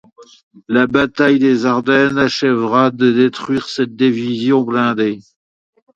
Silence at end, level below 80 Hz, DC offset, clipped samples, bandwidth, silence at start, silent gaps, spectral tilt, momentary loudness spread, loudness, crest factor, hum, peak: 0.75 s; -54 dBFS; under 0.1%; under 0.1%; 7.8 kHz; 0.2 s; 0.43-0.51 s; -6 dB/octave; 7 LU; -15 LUFS; 14 dB; none; 0 dBFS